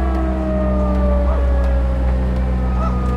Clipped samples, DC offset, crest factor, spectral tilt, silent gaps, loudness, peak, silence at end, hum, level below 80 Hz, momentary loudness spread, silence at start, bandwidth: under 0.1%; under 0.1%; 8 dB; -9.5 dB/octave; none; -19 LUFS; -8 dBFS; 0 s; none; -18 dBFS; 2 LU; 0 s; 5 kHz